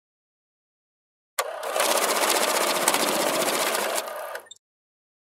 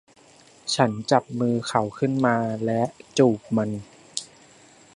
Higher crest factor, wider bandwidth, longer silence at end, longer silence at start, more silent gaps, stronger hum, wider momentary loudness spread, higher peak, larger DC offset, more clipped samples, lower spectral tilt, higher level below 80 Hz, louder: about the same, 26 dB vs 22 dB; first, 16 kHz vs 11.5 kHz; first, 0.85 s vs 0.7 s; first, 1.4 s vs 0.65 s; neither; neither; about the same, 12 LU vs 13 LU; about the same, 0 dBFS vs -2 dBFS; neither; neither; second, -0.5 dB/octave vs -5.5 dB/octave; second, -82 dBFS vs -62 dBFS; about the same, -23 LUFS vs -24 LUFS